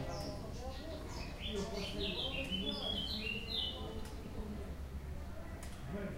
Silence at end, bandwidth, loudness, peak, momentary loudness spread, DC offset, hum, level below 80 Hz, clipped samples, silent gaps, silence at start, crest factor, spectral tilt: 0 s; 16 kHz; -41 LUFS; -26 dBFS; 10 LU; under 0.1%; none; -48 dBFS; under 0.1%; none; 0 s; 16 dB; -4.5 dB/octave